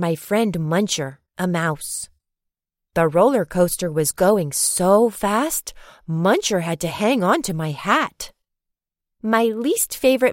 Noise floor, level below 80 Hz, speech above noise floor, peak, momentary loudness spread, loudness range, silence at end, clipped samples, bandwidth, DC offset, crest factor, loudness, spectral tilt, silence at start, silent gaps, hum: -83 dBFS; -50 dBFS; 63 dB; -4 dBFS; 11 LU; 3 LU; 0 s; under 0.1%; 16.5 kHz; under 0.1%; 16 dB; -20 LUFS; -4.5 dB/octave; 0 s; none; none